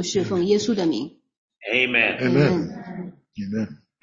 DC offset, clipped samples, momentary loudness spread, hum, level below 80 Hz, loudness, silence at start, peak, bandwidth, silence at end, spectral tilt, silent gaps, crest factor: under 0.1%; under 0.1%; 17 LU; none; -58 dBFS; -21 LUFS; 0 s; -4 dBFS; 7.8 kHz; 0.25 s; -5 dB/octave; 1.38-1.48 s; 18 dB